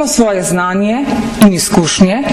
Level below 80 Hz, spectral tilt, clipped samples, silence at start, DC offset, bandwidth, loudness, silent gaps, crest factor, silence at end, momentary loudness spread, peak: -36 dBFS; -4.5 dB/octave; under 0.1%; 0 s; under 0.1%; 16 kHz; -11 LUFS; none; 10 dB; 0 s; 5 LU; 0 dBFS